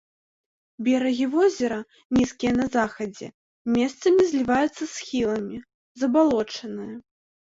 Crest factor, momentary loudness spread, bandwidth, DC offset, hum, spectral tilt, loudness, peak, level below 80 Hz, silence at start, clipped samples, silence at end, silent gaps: 16 dB; 15 LU; 8 kHz; under 0.1%; none; -5 dB/octave; -24 LUFS; -8 dBFS; -56 dBFS; 0.8 s; under 0.1%; 0.6 s; 2.05-2.10 s, 3.34-3.65 s, 5.74-5.95 s